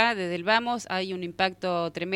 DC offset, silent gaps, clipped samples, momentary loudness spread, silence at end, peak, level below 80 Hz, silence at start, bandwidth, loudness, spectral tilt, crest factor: under 0.1%; none; under 0.1%; 6 LU; 0 s; -6 dBFS; -66 dBFS; 0 s; 15.5 kHz; -27 LUFS; -4.5 dB/octave; 20 dB